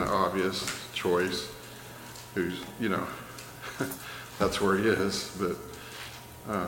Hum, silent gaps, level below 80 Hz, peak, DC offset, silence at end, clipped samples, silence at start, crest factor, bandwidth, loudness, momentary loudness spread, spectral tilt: none; none; -56 dBFS; -12 dBFS; under 0.1%; 0 s; under 0.1%; 0 s; 20 dB; 17 kHz; -31 LUFS; 17 LU; -4.5 dB/octave